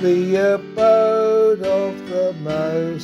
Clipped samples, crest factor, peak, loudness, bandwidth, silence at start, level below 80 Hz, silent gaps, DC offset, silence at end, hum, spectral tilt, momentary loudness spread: under 0.1%; 12 dB; -4 dBFS; -18 LUFS; 12 kHz; 0 s; -56 dBFS; none; under 0.1%; 0 s; none; -7 dB/octave; 7 LU